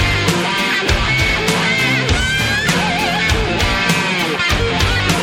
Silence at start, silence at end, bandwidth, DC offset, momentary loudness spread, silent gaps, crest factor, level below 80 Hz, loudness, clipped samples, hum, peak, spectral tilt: 0 s; 0 s; 17 kHz; under 0.1%; 2 LU; none; 14 dB; -26 dBFS; -15 LUFS; under 0.1%; none; 0 dBFS; -3.5 dB/octave